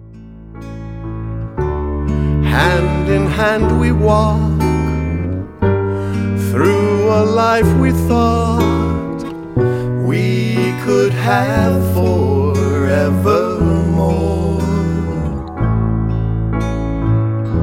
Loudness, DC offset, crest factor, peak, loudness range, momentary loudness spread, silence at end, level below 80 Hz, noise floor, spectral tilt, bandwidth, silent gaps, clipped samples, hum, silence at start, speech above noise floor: -15 LUFS; under 0.1%; 14 dB; -2 dBFS; 3 LU; 8 LU; 0 s; -26 dBFS; -35 dBFS; -7.5 dB/octave; 16.5 kHz; none; under 0.1%; none; 0 s; 22 dB